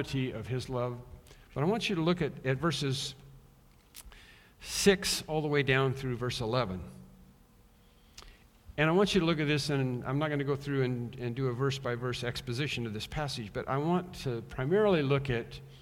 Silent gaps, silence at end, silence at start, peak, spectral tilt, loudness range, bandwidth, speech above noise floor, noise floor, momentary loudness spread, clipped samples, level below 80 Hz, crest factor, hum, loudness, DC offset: none; 0 s; 0 s; -10 dBFS; -5 dB/octave; 3 LU; 16.5 kHz; 30 dB; -61 dBFS; 11 LU; under 0.1%; -54 dBFS; 22 dB; none; -31 LUFS; under 0.1%